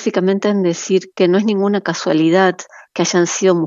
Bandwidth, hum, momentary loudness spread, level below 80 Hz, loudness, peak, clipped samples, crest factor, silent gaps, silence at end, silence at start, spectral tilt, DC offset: 7.8 kHz; none; 5 LU; -72 dBFS; -15 LUFS; 0 dBFS; under 0.1%; 14 dB; none; 0 s; 0 s; -5 dB/octave; under 0.1%